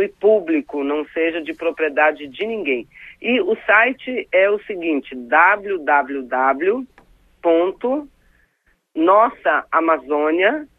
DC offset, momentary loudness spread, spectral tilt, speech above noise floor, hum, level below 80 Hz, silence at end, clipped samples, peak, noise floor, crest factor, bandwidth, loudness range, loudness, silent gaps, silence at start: under 0.1%; 10 LU; -6 dB/octave; 45 dB; none; -60 dBFS; 0.15 s; under 0.1%; 0 dBFS; -63 dBFS; 18 dB; 4 kHz; 4 LU; -18 LUFS; none; 0 s